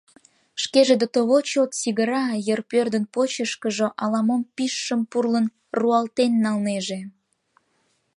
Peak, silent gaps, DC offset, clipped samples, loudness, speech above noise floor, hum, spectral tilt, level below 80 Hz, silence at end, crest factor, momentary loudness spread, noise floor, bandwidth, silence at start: -4 dBFS; none; under 0.1%; under 0.1%; -22 LUFS; 47 dB; none; -4 dB/octave; -74 dBFS; 1.05 s; 18 dB; 7 LU; -68 dBFS; 11.5 kHz; 0.55 s